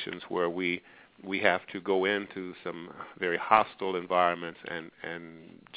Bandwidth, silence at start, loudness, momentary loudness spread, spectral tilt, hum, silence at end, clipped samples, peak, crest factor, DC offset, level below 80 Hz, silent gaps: 4 kHz; 0 s; -30 LUFS; 15 LU; -2 dB/octave; none; 0 s; under 0.1%; -4 dBFS; 26 dB; under 0.1%; -68 dBFS; none